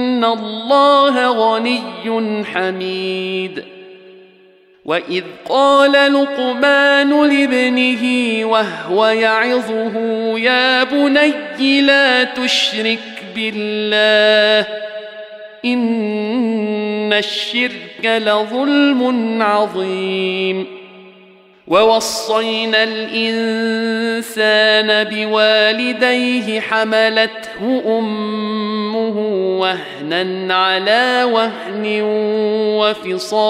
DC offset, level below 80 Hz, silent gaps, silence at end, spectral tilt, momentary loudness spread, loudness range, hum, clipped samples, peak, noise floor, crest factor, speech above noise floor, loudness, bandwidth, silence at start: under 0.1%; -64 dBFS; none; 0 s; -4 dB/octave; 10 LU; 5 LU; none; under 0.1%; -2 dBFS; -48 dBFS; 14 dB; 33 dB; -15 LUFS; 15.5 kHz; 0 s